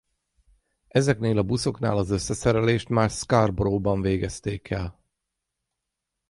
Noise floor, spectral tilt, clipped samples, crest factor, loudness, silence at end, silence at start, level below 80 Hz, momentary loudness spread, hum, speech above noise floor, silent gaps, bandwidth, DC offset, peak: -83 dBFS; -6 dB/octave; under 0.1%; 20 dB; -24 LUFS; 1.4 s; 0.95 s; -44 dBFS; 8 LU; none; 60 dB; none; 11.5 kHz; under 0.1%; -6 dBFS